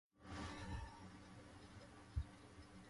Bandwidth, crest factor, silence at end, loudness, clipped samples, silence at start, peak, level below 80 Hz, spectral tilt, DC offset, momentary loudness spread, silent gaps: 11.5 kHz; 22 dB; 0 s; -54 LUFS; under 0.1%; 0.15 s; -30 dBFS; -56 dBFS; -5.5 dB/octave; under 0.1%; 10 LU; none